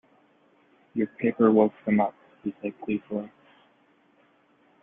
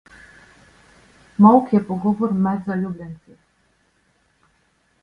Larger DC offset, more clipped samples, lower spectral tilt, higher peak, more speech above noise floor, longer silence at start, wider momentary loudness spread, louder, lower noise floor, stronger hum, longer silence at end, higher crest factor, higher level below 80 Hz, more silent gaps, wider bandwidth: neither; neither; first, -11.5 dB/octave vs -10 dB/octave; second, -8 dBFS vs 0 dBFS; second, 38 dB vs 46 dB; second, 0.95 s vs 1.4 s; second, 16 LU vs 21 LU; second, -26 LUFS vs -18 LUFS; about the same, -63 dBFS vs -63 dBFS; neither; second, 1.55 s vs 1.9 s; about the same, 22 dB vs 22 dB; second, -70 dBFS vs -58 dBFS; neither; second, 3.7 kHz vs 5 kHz